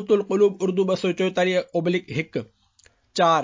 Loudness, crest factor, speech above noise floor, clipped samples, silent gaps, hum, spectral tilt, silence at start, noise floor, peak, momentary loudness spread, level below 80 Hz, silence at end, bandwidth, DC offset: -23 LUFS; 16 dB; 38 dB; under 0.1%; none; none; -5.5 dB/octave; 0 s; -59 dBFS; -6 dBFS; 9 LU; -64 dBFS; 0 s; 7.6 kHz; under 0.1%